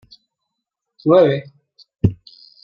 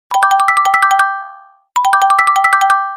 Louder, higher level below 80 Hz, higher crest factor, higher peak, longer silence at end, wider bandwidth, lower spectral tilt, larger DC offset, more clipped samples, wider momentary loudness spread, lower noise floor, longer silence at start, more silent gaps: second, -17 LUFS vs -11 LUFS; first, -44 dBFS vs -60 dBFS; first, 18 dB vs 12 dB; about the same, -2 dBFS vs 0 dBFS; first, 0.5 s vs 0 s; second, 5.4 kHz vs 16 kHz; first, -9.5 dB/octave vs 2 dB/octave; neither; neither; first, 11 LU vs 7 LU; first, -80 dBFS vs -38 dBFS; first, 1.05 s vs 0.1 s; neither